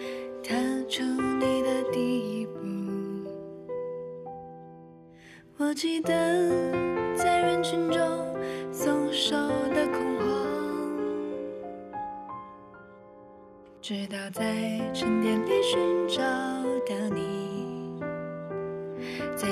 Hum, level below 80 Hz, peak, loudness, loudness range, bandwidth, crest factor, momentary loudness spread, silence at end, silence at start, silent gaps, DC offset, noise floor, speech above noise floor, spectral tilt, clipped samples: none; -62 dBFS; -14 dBFS; -29 LUFS; 9 LU; 13.5 kHz; 16 dB; 14 LU; 0 s; 0 s; none; under 0.1%; -51 dBFS; 24 dB; -4.5 dB/octave; under 0.1%